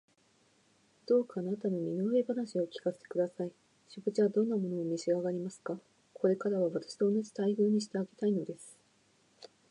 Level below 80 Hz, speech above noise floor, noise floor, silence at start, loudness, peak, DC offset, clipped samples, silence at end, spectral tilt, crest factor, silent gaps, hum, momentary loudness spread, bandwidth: -86 dBFS; 37 dB; -69 dBFS; 1.1 s; -33 LUFS; -16 dBFS; under 0.1%; under 0.1%; 0.25 s; -7 dB/octave; 16 dB; none; none; 12 LU; 11 kHz